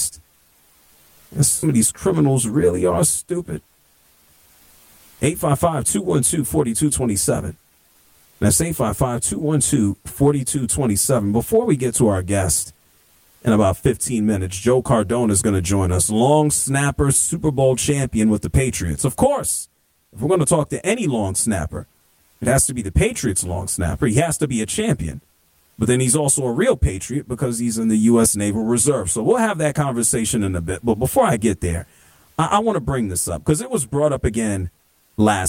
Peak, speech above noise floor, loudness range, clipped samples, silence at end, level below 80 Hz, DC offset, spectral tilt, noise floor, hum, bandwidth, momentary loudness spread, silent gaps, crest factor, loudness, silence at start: -4 dBFS; 40 dB; 4 LU; under 0.1%; 0 s; -36 dBFS; under 0.1%; -5 dB/octave; -58 dBFS; none; 17 kHz; 7 LU; none; 16 dB; -19 LUFS; 0 s